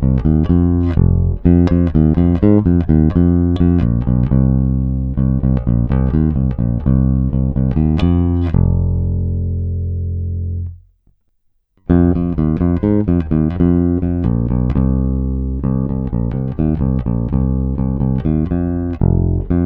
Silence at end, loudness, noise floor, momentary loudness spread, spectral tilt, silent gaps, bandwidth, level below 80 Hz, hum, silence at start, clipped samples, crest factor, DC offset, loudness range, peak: 0 s; -16 LUFS; -61 dBFS; 7 LU; -12 dB/octave; none; 4.2 kHz; -22 dBFS; none; 0 s; under 0.1%; 14 dB; under 0.1%; 5 LU; 0 dBFS